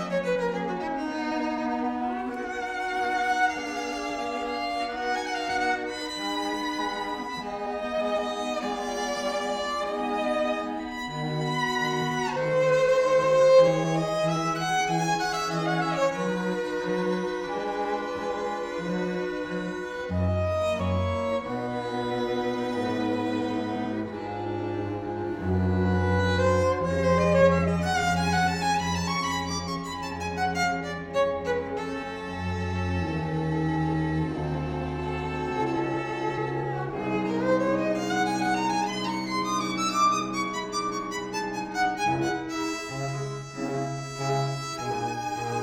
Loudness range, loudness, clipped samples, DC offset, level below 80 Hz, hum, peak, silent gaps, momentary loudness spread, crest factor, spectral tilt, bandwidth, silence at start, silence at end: 6 LU; -27 LUFS; under 0.1%; under 0.1%; -50 dBFS; none; -8 dBFS; none; 8 LU; 18 dB; -5.5 dB/octave; 16 kHz; 0 s; 0 s